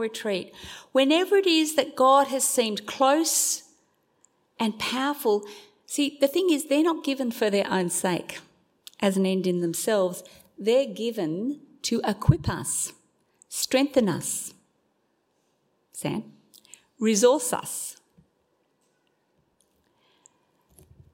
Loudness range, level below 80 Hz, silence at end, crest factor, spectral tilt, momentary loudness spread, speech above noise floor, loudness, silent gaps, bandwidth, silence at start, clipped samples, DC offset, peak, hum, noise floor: 7 LU; -54 dBFS; 3.2 s; 22 dB; -4 dB/octave; 12 LU; 47 dB; -25 LUFS; none; 16.5 kHz; 0 s; under 0.1%; under 0.1%; -4 dBFS; none; -71 dBFS